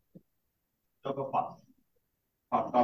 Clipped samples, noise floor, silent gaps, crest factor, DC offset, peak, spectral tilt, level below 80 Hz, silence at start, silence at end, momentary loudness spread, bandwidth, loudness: under 0.1%; -80 dBFS; none; 22 dB; under 0.1%; -12 dBFS; -8 dB/octave; -76 dBFS; 0.15 s; 0 s; 12 LU; 6.2 kHz; -34 LUFS